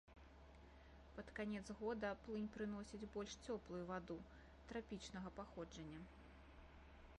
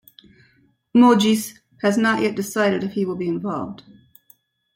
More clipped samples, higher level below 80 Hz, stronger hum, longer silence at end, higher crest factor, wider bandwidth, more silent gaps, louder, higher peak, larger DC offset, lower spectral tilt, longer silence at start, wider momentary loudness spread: neither; about the same, -66 dBFS vs -64 dBFS; neither; second, 0 s vs 1 s; about the same, 16 dB vs 18 dB; second, 10.5 kHz vs 16.5 kHz; neither; second, -51 LUFS vs -20 LUFS; second, -36 dBFS vs -4 dBFS; neither; about the same, -5.5 dB/octave vs -5 dB/octave; second, 0.05 s vs 0.95 s; first, 17 LU vs 13 LU